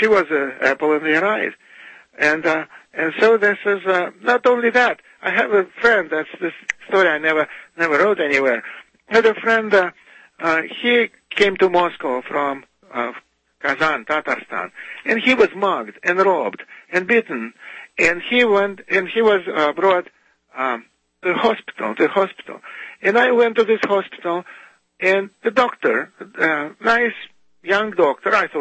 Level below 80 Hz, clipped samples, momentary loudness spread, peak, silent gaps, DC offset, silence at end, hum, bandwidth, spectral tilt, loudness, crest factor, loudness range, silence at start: -60 dBFS; under 0.1%; 11 LU; -2 dBFS; none; under 0.1%; 0 s; none; 8.6 kHz; -4.5 dB/octave; -18 LUFS; 18 dB; 3 LU; 0 s